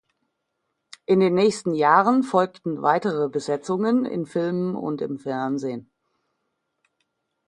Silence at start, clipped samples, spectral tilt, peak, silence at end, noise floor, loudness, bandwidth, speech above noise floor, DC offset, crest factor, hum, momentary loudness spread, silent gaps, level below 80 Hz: 1.1 s; under 0.1%; -6.5 dB/octave; -2 dBFS; 1.65 s; -77 dBFS; -22 LUFS; 11 kHz; 56 dB; under 0.1%; 20 dB; none; 11 LU; none; -70 dBFS